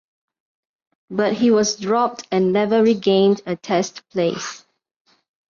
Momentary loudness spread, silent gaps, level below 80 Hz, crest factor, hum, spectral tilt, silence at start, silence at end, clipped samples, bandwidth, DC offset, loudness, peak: 8 LU; none; -64 dBFS; 16 dB; none; -5 dB/octave; 1.1 s; 0.9 s; under 0.1%; 7.4 kHz; under 0.1%; -19 LUFS; -6 dBFS